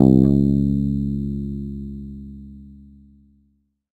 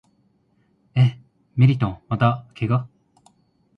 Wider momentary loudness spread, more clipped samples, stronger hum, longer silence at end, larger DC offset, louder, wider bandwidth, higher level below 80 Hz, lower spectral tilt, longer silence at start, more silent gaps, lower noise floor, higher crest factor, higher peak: first, 24 LU vs 10 LU; neither; neither; first, 1.25 s vs 0.9 s; neither; about the same, -20 LUFS vs -21 LUFS; second, 4.4 kHz vs 5 kHz; first, -34 dBFS vs -52 dBFS; first, -12 dB/octave vs -9 dB/octave; second, 0 s vs 0.95 s; neither; about the same, -65 dBFS vs -63 dBFS; about the same, 20 dB vs 20 dB; first, 0 dBFS vs -4 dBFS